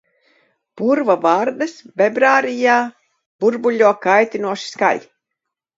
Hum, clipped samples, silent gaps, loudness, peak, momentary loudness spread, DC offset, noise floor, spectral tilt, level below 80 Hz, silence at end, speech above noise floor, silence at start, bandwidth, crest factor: none; under 0.1%; 3.26-3.39 s; -17 LUFS; 0 dBFS; 10 LU; under 0.1%; -80 dBFS; -4.5 dB/octave; -72 dBFS; 0.8 s; 64 dB; 0.75 s; 7.8 kHz; 18 dB